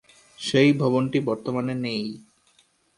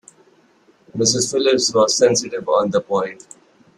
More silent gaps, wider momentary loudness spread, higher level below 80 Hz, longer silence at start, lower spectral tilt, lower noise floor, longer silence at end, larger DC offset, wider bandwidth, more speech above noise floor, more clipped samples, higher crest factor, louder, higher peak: neither; first, 14 LU vs 8 LU; about the same, -64 dBFS vs -60 dBFS; second, 0.4 s vs 0.95 s; first, -6 dB/octave vs -3 dB/octave; first, -63 dBFS vs -55 dBFS; about the same, 0.75 s vs 0.65 s; neither; second, 11.5 kHz vs 13 kHz; about the same, 40 dB vs 37 dB; neither; about the same, 18 dB vs 18 dB; second, -23 LUFS vs -17 LUFS; second, -6 dBFS vs -2 dBFS